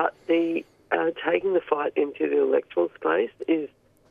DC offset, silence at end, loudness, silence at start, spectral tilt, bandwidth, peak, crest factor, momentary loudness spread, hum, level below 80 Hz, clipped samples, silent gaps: under 0.1%; 0.45 s; -25 LUFS; 0 s; -7 dB/octave; 4.7 kHz; -8 dBFS; 18 dB; 5 LU; none; -70 dBFS; under 0.1%; none